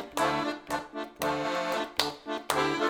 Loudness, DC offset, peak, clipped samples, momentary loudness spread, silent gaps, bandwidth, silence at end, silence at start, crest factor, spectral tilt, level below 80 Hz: -31 LUFS; under 0.1%; -4 dBFS; under 0.1%; 7 LU; none; over 20 kHz; 0 s; 0 s; 26 dB; -3 dB/octave; -62 dBFS